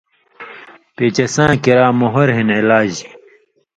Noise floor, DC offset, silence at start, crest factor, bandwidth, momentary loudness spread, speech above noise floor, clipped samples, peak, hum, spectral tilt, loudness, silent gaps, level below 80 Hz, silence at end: -51 dBFS; under 0.1%; 0.4 s; 16 dB; 10 kHz; 19 LU; 38 dB; under 0.1%; 0 dBFS; none; -5.5 dB/octave; -13 LUFS; none; -48 dBFS; 0.7 s